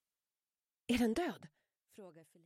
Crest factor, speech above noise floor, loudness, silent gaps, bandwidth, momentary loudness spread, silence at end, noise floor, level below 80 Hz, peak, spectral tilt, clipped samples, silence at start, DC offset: 18 dB; over 52 dB; -36 LUFS; none; 16 kHz; 24 LU; 0.25 s; under -90 dBFS; -64 dBFS; -22 dBFS; -4.5 dB/octave; under 0.1%; 0.9 s; under 0.1%